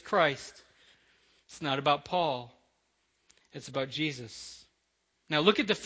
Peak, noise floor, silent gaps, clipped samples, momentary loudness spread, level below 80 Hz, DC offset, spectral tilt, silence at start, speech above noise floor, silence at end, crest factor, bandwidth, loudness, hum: -8 dBFS; -77 dBFS; none; under 0.1%; 22 LU; -68 dBFS; under 0.1%; -4.5 dB/octave; 0.05 s; 46 dB; 0 s; 26 dB; 8 kHz; -30 LUFS; none